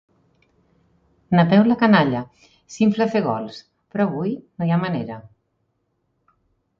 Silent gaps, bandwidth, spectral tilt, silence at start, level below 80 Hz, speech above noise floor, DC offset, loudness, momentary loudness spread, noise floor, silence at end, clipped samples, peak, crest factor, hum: none; 7.4 kHz; -7.5 dB/octave; 1.3 s; -60 dBFS; 52 dB; under 0.1%; -20 LUFS; 20 LU; -71 dBFS; 1.6 s; under 0.1%; -2 dBFS; 20 dB; none